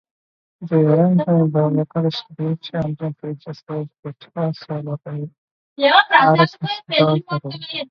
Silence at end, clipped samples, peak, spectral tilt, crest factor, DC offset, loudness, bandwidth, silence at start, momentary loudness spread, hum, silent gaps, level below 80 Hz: 0.05 s; under 0.1%; 0 dBFS; -8 dB/octave; 20 dB; under 0.1%; -18 LUFS; 6.2 kHz; 0.6 s; 17 LU; none; 3.99-4.03 s, 5.38-5.76 s; -60 dBFS